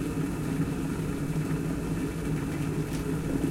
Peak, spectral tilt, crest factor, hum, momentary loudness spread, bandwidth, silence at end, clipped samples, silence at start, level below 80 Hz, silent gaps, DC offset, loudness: -16 dBFS; -7 dB/octave; 14 dB; none; 1 LU; 16 kHz; 0 s; under 0.1%; 0 s; -42 dBFS; none; under 0.1%; -31 LUFS